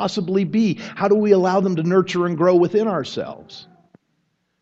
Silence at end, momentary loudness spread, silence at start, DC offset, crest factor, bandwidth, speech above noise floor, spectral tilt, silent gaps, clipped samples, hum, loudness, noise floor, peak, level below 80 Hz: 1 s; 13 LU; 0 s; under 0.1%; 18 dB; 7.8 kHz; 51 dB; -7 dB/octave; none; under 0.1%; none; -19 LUFS; -69 dBFS; -2 dBFS; -64 dBFS